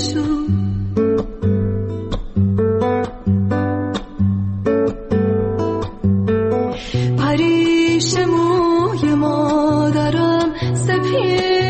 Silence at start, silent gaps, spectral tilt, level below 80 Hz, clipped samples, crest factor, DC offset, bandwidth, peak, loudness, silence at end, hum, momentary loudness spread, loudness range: 0 s; none; -6.5 dB/octave; -36 dBFS; under 0.1%; 10 dB; under 0.1%; 8.8 kHz; -6 dBFS; -17 LUFS; 0 s; none; 6 LU; 4 LU